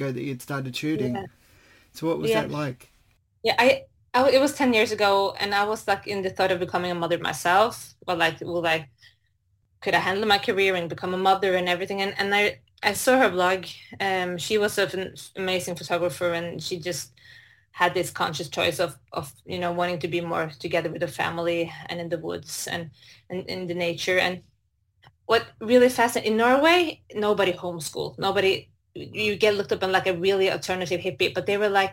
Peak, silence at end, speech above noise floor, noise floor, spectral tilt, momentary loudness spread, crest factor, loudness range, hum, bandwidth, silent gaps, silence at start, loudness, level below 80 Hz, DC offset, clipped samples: -4 dBFS; 0 s; 45 dB; -69 dBFS; -4 dB/octave; 11 LU; 20 dB; 6 LU; none; 17 kHz; none; 0 s; -24 LUFS; -62 dBFS; under 0.1%; under 0.1%